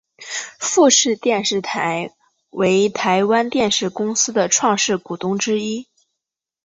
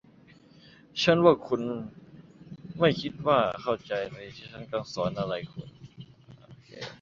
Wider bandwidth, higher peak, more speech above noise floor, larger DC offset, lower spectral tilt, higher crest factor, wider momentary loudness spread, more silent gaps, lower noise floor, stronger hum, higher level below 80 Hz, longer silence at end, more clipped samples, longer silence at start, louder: about the same, 8 kHz vs 7.4 kHz; first, -2 dBFS vs -6 dBFS; first, 65 dB vs 29 dB; neither; second, -2.5 dB/octave vs -6 dB/octave; second, 16 dB vs 24 dB; second, 13 LU vs 22 LU; neither; first, -83 dBFS vs -56 dBFS; neither; about the same, -62 dBFS vs -62 dBFS; first, 0.85 s vs 0.05 s; neither; second, 0.2 s vs 0.95 s; first, -18 LUFS vs -27 LUFS